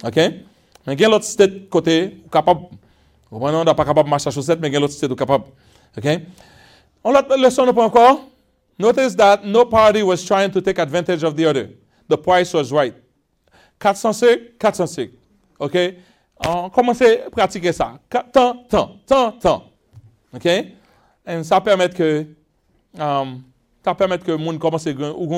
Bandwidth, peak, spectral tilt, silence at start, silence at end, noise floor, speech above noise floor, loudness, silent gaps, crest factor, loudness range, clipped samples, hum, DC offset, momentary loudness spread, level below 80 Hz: 15.5 kHz; 0 dBFS; -5 dB/octave; 0.05 s; 0 s; -62 dBFS; 45 dB; -17 LUFS; none; 18 dB; 6 LU; under 0.1%; none; under 0.1%; 11 LU; -50 dBFS